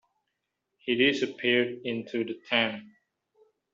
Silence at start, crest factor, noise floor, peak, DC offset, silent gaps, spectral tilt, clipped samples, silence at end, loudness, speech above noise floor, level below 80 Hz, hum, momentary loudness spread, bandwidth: 0.85 s; 20 dB; -82 dBFS; -10 dBFS; under 0.1%; none; -1.5 dB/octave; under 0.1%; 0.85 s; -27 LUFS; 55 dB; -72 dBFS; none; 10 LU; 7.6 kHz